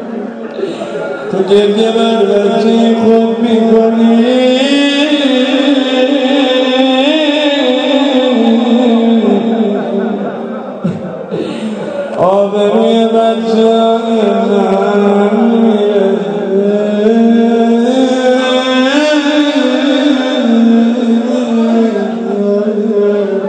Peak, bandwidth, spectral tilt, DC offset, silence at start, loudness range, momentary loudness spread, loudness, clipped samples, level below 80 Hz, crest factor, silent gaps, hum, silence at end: 0 dBFS; 9 kHz; -5.5 dB/octave; under 0.1%; 0 s; 4 LU; 10 LU; -10 LUFS; 0.3%; -56 dBFS; 10 dB; none; none; 0 s